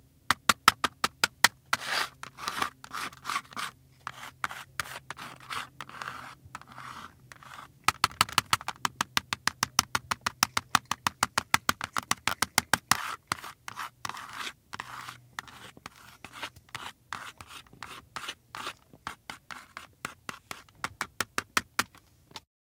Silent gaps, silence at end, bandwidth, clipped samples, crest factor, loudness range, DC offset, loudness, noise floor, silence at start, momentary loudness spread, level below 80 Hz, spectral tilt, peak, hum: none; 0.35 s; 18 kHz; under 0.1%; 34 dB; 14 LU; under 0.1%; -31 LUFS; -58 dBFS; 0.3 s; 19 LU; -64 dBFS; -1 dB/octave; 0 dBFS; none